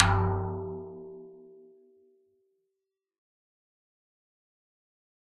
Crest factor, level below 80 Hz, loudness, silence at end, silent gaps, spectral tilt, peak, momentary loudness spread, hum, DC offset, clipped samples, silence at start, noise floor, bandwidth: 34 dB; -50 dBFS; -31 LUFS; 3.85 s; none; -5 dB/octave; 0 dBFS; 25 LU; none; under 0.1%; under 0.1%; 0 s; -86 dBFS; 7 kHz